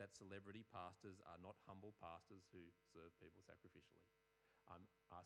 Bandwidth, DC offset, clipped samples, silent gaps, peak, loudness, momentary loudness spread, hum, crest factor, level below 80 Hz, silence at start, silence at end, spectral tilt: 10 kHz; under 0.1%; under 0.1%; none; -42 dBFS; -62 LUFS; 9 LU; none; 20 dB; -90 dBFS; 0 s; 0 s; -5.5 dB/octave